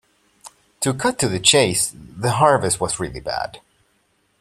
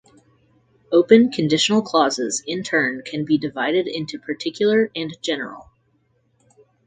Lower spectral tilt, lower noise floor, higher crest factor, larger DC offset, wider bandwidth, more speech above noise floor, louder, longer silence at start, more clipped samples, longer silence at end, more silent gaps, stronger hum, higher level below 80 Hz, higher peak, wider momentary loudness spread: about the same, -3 dB/octave vs -4 dB/octave; about the same, -64 dBFS vs -64 dBFS; about the same, 22 dB vs 20 dB; neither; first, 15 kHz vs 9.6 kHz; about the same, 45 dB vs 45 dB; about the same, -19 LUFS vs -20 LUFS; second, 0.45 s vs 0.9 s; neither; second, 0.85 s vs 1.25 s; neither; neither; first, -50 dBFS vs -64 dBFS; about the same, 0 dBFS vs 0 dBFS; about the same, 12 LU vs 13 LU